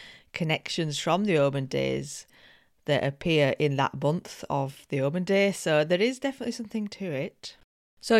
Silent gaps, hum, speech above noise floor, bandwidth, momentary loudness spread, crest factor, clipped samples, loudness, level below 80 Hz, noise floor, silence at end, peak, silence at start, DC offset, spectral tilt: 7.64-7.97 s; none; 31 dB; 15 kHz; 12 LU; 20 dB; under 0.1%; -27 LUFS; -62 dBFS; -58 dBFS; 0 s; -8 dBFS; 0 s; under 0.1%; -5.5 dB/octave